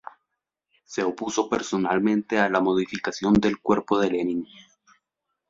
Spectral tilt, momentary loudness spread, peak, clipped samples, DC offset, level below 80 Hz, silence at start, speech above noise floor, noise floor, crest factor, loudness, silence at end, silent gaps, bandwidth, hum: -5.5 dB/octave; 8 LU; -6 dBFS; under 0.1%; under 0.1%; -54 dBFS; 0.9 s; 58 dB; -82 dBFS; 20 dB; -24 LUFS; 1.05 s; none; 7.8 kHz; none